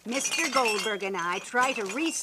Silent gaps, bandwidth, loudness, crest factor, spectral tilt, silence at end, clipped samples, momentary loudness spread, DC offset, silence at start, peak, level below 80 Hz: none; 15.5 kHz; -27 LUFS; 18 dB; -1.5 dB/octave; 0 s; under 0.1%; 5 LU; under 0.1%; 0.05 s; -10 dBFS; -74 dBFS